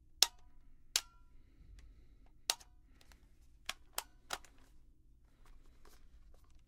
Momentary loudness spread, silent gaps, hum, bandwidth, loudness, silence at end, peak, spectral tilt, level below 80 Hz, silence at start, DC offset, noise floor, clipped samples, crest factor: 29 LU; none; none; 16 kHz; -39 LUFS; 0 s; -6 dBFS; 1.5 dB/octave; -62 dBFS; 0.05 s; under 0.1%; -64 dBFS; under 0.1%; 40 dB